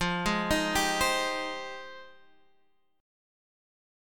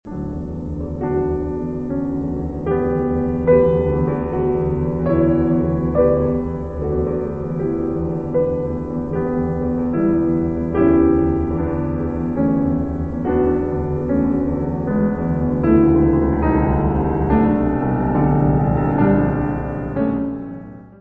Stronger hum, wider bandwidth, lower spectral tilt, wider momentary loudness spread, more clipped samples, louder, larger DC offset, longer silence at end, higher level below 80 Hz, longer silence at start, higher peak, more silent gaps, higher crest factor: neither; first, 17.5 kHz vs 3.5 kHz; second, -3 dB/octave vs -12 dB/octave; first, 17 LU vs 9 LU; neither; second, -28 LUFS vs -19 LUFS; second, under 0.1% vs 0.6%; first, 1 s vs 0 s; second, -48 dBFS vs -30 dBFS; about the same, 0 s vs 0.05 s; second, -12 dBFS vs -2 dBFS; neither; about the same, 20 dB vs 16 dB